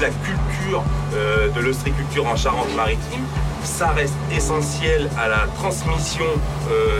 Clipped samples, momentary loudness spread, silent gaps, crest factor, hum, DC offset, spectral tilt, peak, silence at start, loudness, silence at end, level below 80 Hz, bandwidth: under 0.1%; 4 LU; none; 14 dB; none; under 0.1%; -5 dB/octave; -6 dBFS; 0 s; -21 LUFS; 0 s; -28 dBFS; 15.5 kHz